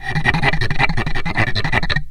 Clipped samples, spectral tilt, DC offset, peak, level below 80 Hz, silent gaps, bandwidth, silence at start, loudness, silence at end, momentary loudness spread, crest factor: under 0.1%; -5.5 dB/octave; under 0.1%; 0 dBFS; -24 dBFS; none; 10 kHz; 0 s; -18 LUFS; 0 s; 4 LU; 16 dB